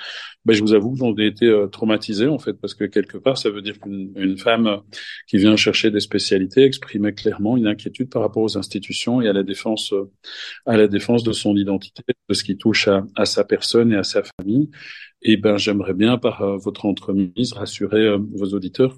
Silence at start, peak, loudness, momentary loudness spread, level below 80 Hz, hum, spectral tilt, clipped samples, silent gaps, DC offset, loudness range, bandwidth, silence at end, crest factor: 0 s; -2 dBFS; -19 LUFS; 10 LU; -60 dBFS; none; -5.5 dB/octave; under 0.1%; 14.33-14.38 s; under 0.1%; 3 LU; 12 kHz; 0.05 s; 18 dB